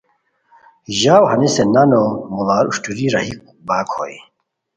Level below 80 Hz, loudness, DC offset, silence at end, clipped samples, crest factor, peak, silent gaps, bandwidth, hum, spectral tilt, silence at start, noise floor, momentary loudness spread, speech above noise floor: -54 dBFS; -16 LUFS; under 0.1%; 0.55 s; under 0.1%; 16 dB; 0 dBFS; none; 9.4 kHz; none; -5 dB/octave; 0.9 s; -63 dBFS; 13 LU; 47 dB